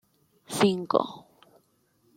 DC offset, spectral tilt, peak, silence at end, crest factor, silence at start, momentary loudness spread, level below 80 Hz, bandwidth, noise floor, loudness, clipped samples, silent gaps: under 0.1%; -5 dB/octave; -6 dBFS; 0.95 s; 24 dB; 0.5 s; 15 LU; -74 dBFS; 16.5 kHz; -68 dBFS; -27 LUFS; under 0.1%; none